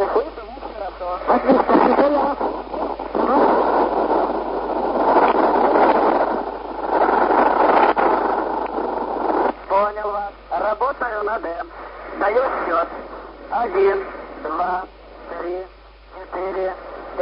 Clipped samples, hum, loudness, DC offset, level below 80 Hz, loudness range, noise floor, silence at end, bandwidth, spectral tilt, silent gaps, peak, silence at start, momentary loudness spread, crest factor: under 0.1%; none; -19 LUFS; under 0.1%; -46 dBFS; 7 LU; -43 dBFS; 0 s; 5.6 kHz; -9.5 dB/octave; none; -2 dBFS; 0 s; 16 LU; 16 dB